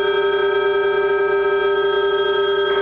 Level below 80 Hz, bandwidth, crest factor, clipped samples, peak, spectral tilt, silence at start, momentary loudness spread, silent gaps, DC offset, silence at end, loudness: -52 dBFS; 4.5 kHz; 10 dB; under 0.1%; -8 dBFS; -6 dB/octave; 0 s; 0 LU; none; under 0.1%; 0 s; -18 LUFS